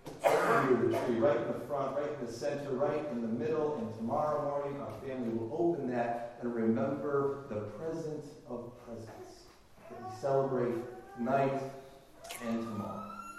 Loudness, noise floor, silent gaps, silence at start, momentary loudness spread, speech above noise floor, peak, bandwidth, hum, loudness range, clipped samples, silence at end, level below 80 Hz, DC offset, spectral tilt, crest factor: -34 LUFS; -57 dBFS; none; 0.05 s; 16 LU; 22 dB; -14 dBFS; 15 kHz; none; 6 LU; under 0.1%; 0 s; -68 dBFS; under 0.1%; -6.5 dB/octave; 20 dB